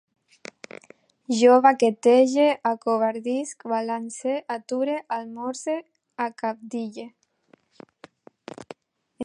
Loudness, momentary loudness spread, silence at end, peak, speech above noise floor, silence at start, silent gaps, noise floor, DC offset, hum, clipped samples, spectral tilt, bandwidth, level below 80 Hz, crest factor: -23 LUFS; 26 LU; 0 s; -4 dBFS; 39 dB; 1.3 s; none; -61 dBFS; under 0.1%; none; under 0.1%; -4 dB/octave; 11 kHz; -76 dBFS; 20 dB